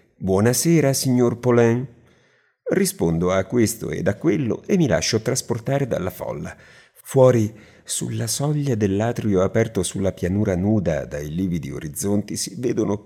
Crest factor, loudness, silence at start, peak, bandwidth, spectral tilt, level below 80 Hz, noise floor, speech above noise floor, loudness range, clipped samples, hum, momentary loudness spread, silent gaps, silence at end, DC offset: 18 dB; -21 LUFS; 0.2 s; -2 dBFS; 18 kHz; -5.5 dB/octave; -50 dBFS; -60 dBFS; 40 dB; 3 LU; under 0.1%; none; 10 LU; none; 0.05 s; under 0.1%